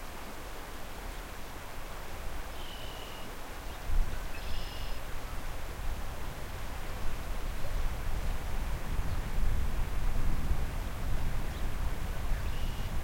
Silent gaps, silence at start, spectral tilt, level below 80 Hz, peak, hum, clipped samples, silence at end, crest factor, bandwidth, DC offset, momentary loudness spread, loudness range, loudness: none; 0 s; -5 dB/octave; -34 dBFS; -16 dBFS; none; under 0.1%; 0 s; 16 dB; 16.5 kHz; under 0.1%; 7 LU; 5 LU; -40 LUFS